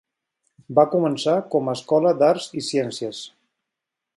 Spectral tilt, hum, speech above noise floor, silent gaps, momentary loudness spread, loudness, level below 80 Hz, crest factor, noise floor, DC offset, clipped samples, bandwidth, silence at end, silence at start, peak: -5.5 dB/octave; none; 64 dB; none; 13 LU; -21 LUFS; -72 dBFS; 20 dB; -84 dBFS; under 0.1%; under 0.1%; 11.5 kHz; 0.9 s; 0.7 s; -2 dBFS